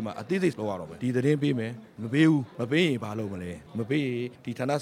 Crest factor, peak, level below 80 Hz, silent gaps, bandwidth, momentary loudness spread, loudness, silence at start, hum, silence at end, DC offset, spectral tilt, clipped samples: 18 dB; -10 dBFS; -64 dBFS; none; 14.5 kHz; 12 LU; -28 LUFS; 0 s; none; 0 s; under 0.1%; -7 dB/octave; under 0.1%